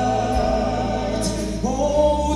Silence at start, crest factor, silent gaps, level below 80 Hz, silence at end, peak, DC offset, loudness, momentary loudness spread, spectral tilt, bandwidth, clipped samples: 0 s; 14 dB; none; -30 dBFS; 0 s; -6 dBFS; under 0.1%; -21 LUFS; 6 LU; -5.5 dB/octave; 13 kHz; under 0.1%